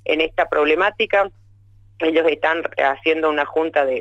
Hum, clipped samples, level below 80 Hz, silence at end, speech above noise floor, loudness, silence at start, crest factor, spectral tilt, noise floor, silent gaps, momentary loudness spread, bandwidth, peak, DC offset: none; under 0.1%; -52 dBFS; 0 s; 31 dB; -19 LUFS; 0.05 s; 14 dB; -5 dB/octave; -49 dBFS; none; 3 LU; 7.8 kHz; -4 dBFS; under 0.1%